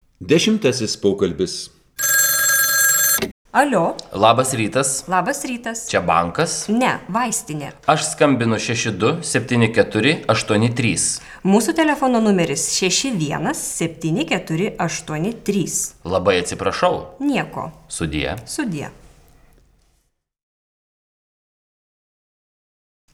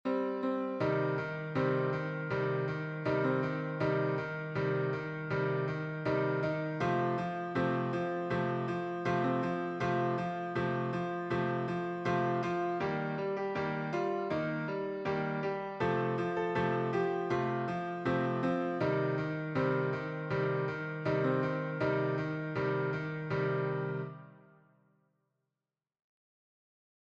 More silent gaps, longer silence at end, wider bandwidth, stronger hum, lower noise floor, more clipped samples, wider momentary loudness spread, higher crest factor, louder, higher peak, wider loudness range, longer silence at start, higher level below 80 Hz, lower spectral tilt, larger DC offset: first, 3.31-3.45 s vs none; first, 4.2 s vs 2.65 s; first, over 20 kHz vs 8 kHz; neither; second, -66 dBFS vs under -90 dBFS; neither; first, 10 LU vs 4 LU; first, 20 dB vs 14 dB; first, -18 LUFS vs -34 LUFS; first, 0 dBFS vs -20 dBFS; first, 9 LU vs 2 LU; first, 0.2 s vs 0.05 s; first, -48 dBFS vs -66 dBFS; second, -3.5 dB/octave vs -8 dB/octave; neither